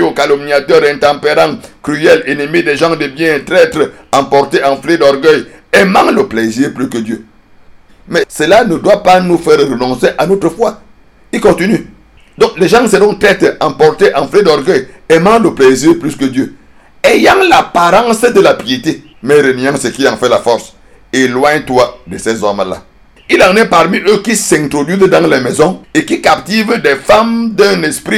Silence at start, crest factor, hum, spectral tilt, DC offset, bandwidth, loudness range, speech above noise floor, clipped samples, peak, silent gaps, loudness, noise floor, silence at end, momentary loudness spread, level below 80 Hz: 0 s; 10 dB; none; -4.5 dB/octave; under 0.1%; 16 kHz; 3 LU; 30 dB; 2%; 0 dBFS; none; -9 LUFS; -39 dBFS; 0 s; 8 LU; -40 dBFS